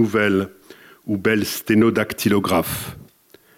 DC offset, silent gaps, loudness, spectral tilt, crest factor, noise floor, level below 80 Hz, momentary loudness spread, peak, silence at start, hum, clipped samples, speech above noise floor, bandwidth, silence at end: under 0.1%; none; -20 LUFS; -5 dB/octave; 14 dB; -53 dBFS; -54 dBFS; 13 LU; -6 dBFS; 0 s; none; under 0.1%; 34 dB; 17 kHz; 0.55 s